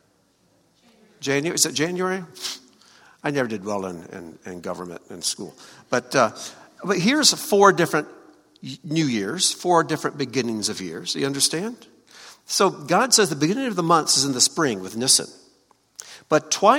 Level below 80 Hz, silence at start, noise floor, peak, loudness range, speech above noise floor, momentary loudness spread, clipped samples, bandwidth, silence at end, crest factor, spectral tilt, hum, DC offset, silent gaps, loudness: -68 dBFS; 1.2 s; -63 dBFS; 0 dBFS; 9 LU; 41 dB; 20 LU; under 0.1%; 17 kHz; 0 s; 24 dB; -2.5 dB/octave; none; under 0.1%; none; -21 LUFS